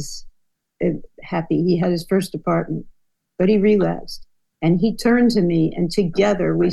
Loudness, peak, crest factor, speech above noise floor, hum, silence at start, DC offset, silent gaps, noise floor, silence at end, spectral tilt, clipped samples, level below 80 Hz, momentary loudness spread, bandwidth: -19 LUFS; -6 dBFS; 14 dB; 46 dB; none; 0 s; under 0.1%; none; -64 dBFS; 0 s; -7 dB/octave; under 0.1%; -42 dBFS; 14 LU; 12.5 kHz